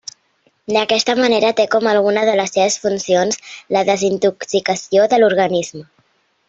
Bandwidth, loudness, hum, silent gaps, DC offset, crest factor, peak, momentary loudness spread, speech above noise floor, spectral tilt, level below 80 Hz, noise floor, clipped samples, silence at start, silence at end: 8 kHz; -16 LUFS; none; none; under 0.1%; 16 dB; 0 dBFS; 7 LU; 45 dB; -3.5 dB/octave; -60 dBFS; -60 dBFS; under 0.1%; 0.7 s; 0.65 s